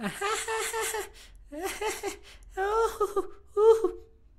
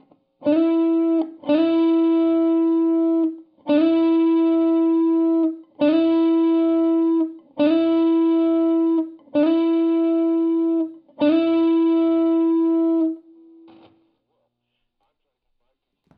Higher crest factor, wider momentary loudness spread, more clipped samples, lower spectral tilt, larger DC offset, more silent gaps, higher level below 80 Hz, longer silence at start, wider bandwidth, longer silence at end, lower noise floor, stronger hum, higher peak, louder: first, 20 dB vs 12 dB; first, 20 LU vs 5 LU; neither; second, -2.5 dB/octave vs -9 dB/octave; neither; neither; first, -52 dBFS vs -78 dBFS; second, 0 s vs 0.4 s; first, 16 kHz vs 4.8 kHz; second, 0.35 s vs 3 s; second, -48 dBFS vs -75 dBFS; second, none vs 60 Hz at -70 dBFS; about the same, -10 dBFS vs -8 dBFS; second, -29 LUFS vs -19 LUFS